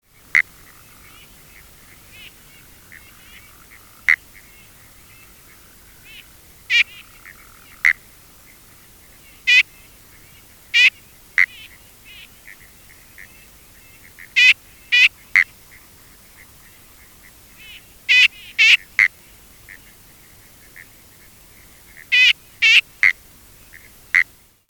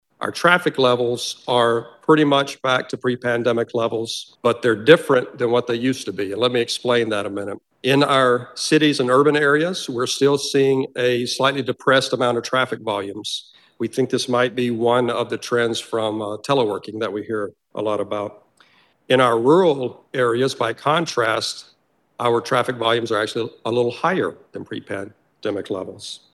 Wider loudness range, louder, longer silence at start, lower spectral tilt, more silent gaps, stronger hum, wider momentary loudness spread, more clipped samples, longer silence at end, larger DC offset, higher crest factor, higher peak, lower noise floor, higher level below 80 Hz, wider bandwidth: first, 10 LU vs 5 LU; first, -15 LUFS vs -20 LUFS; first, 0.35 s vs 0.2 s; second, 1.5 dB/octave vs -4.5 dB/octave; neither; neither; about the same, 13 LU vs 12 LU; neither; first, 0.45 s vs 0.15 s; neither; about the same, 22 dB vs 20 dB; about the same, 0 dBFS vs 0 dBFS; second, -47 dBFS vs -56 dBFS; first, -56 dBFS vs -68 dBFS; first, 19.5 kHz vs 12.5 kHz